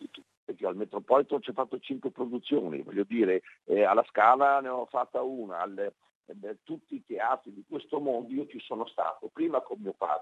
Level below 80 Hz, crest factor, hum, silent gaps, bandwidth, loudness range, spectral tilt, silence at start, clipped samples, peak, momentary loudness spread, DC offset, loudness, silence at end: -84 dBFS; 22 dB; none; 0.37-0.47 s, 6.15-6.23 s; 7.8 kHz; 8 LU; -7 dB/octave; 0 s; under 0.1%; -8 dBFS; 16 LU; under 0.1%; -30 LUFS; 0 s